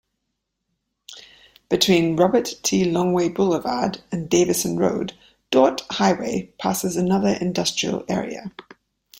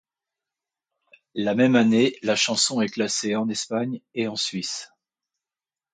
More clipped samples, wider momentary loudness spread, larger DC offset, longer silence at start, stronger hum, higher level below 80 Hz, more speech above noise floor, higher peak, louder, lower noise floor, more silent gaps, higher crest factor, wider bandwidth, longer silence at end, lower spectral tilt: neither; about the same, 12 LU vs 11 LU; neither; second, 1.1 s vs 1.35 s; neither; first, -56 dBFS vs -70 dBFS; second, 57 dB vs over 67 dB; first, -2 dBFS vs -6 dBFS; about the same, -21 LUFS vs -23 LUFS; second, -78 dBFS vs under -90 dBFS; neither; about the same, 20 dB vs 18 dB; first, 16.5 kHz vs 9.6 kHz; second, 0.6 s vs 1.1 s; about the same, -4.5 dB/octave vs -3.5 dB/octave